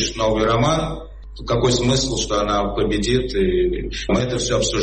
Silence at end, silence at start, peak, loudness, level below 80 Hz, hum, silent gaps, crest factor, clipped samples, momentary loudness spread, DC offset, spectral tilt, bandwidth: 0 s; 0 s; -6 dBFS; -19 LUFS; -32 dBFS; none; none; 12 dB; under 0.1%; 7 LU; 0.4%; -4.5 dB/octave; 8.8 kHz